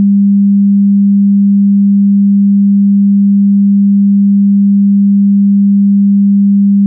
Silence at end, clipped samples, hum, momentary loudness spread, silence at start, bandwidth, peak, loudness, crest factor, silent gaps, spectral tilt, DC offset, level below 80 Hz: 0 s; under 0.1%; none; 0 LU; 0 s; 0.3 kHz; -4 dBFS; -8 LUFS; 4 dB; none; -20 dB/octave; under 0.1%; -74 dBFS